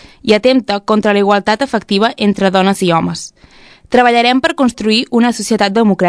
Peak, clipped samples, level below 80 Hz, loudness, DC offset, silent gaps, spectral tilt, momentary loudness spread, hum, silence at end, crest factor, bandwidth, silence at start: 0 dBFS; 0.4%; -48 dBFS; -12 LUFS; under 0.1%; none; -5 dB/octave; 4 LU; none; 0 s; 12 dB; 11 kHz; 0.25 s